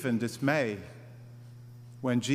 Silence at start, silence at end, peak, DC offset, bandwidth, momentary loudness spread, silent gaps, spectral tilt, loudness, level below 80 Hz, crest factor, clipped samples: 0 s; 0 s; -12 dBFS; under 0.1%; 15.5 kHz; 21 LU; none; -5.5 dB/octave; -31 LUFS; -70 dBFS; 20 dB; under 0.1%